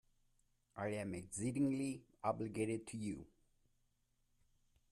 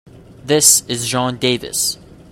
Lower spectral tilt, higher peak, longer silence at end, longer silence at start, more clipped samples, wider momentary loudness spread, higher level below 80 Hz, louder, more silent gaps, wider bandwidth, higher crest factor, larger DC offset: first, -6 dB/octave vs -2 dB/octave; second, -24 dBFS vs 0 dBFS; first, 1.65 s vs 0.35 s; first, 0.75 s vs 0.3 s; neither; second, 8 LU vs 12 LU; second, -72 dBFS vs -50 dBFS; second, -42 LUFS vs -14 LUFS; neither; second, 13.5 kHz vs 16.5 kHz; about the same, 20 dB vs 18 dB; neither